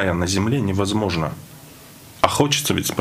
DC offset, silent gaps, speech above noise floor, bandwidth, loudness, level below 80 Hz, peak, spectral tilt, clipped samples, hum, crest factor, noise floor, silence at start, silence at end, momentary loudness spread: under 0.1%; none; 22 dB; 16 kHz; -20 LUFS; -46 dBFS; 0 dBFS; -4.5 dB/octave; under 0.1%; none; 20 dB; -43 dBFS; 0 s; 0 s; 17 LU